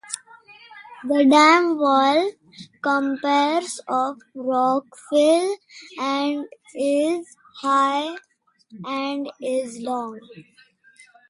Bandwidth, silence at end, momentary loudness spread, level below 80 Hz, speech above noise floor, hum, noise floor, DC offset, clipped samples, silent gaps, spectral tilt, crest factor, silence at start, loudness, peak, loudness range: 11.5 kHz; 0.9 s; 17 LU; -76 dBFS; 32 dB; none; -53 dBFS; under 0.1%; under 0.1%; none; -3 dB/octave; 18 dB; 0.1 s; -21 LUFS; -4 dBFS; 7 LU